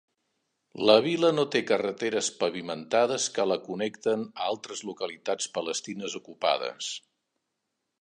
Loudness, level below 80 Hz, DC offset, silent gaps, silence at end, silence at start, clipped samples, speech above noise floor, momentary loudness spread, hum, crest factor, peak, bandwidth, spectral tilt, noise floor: -28 LUFS; -78 dBFS; under 0.1%; none; 1.05 s; 0.75 s; under 0.1%; 54 dB; 13 LU; none; 24 dB; -6 dBFS; 11.5 kHz; -3 dB/octave; -82 dBFS